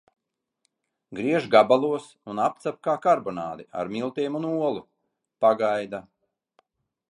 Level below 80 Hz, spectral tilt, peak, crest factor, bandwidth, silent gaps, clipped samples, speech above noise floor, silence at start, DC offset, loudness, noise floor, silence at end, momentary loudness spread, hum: -70 dBFS; -6 dB/octave; -2 dBFS; 24 dB; 11 kHz; none; under 0.1%; 52 dB; 1.1 s; under 0.1%; -24 LUFS; -76 dBFS; 1.1 s; 15 LU; none